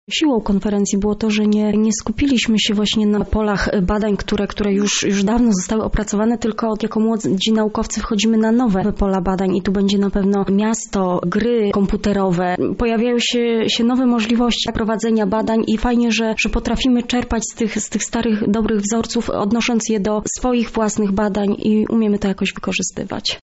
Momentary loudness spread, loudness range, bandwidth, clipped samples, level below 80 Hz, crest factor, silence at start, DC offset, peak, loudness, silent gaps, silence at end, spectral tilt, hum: 4 LU; 2 LU; 8.2 kHz; under 0.1%; -32 dBFS; 10 dB; 0.1 s; under 0.1%; -8 dBFS; -18 LUFS; none; 0.05 s; -4.5 dB/octave; none